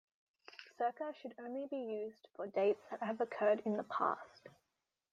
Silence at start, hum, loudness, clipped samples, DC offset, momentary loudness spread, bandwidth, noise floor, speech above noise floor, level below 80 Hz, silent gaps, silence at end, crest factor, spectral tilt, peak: 0.5 s; none; -39 LUFS; under 0.1%; under 0.1%; 14 LU; 7.4 kHz; -88 dBFS; 50 dB; -90 dBFS; none; 0.65 s; 20 dB; -7 dB/octave; -20 dBFS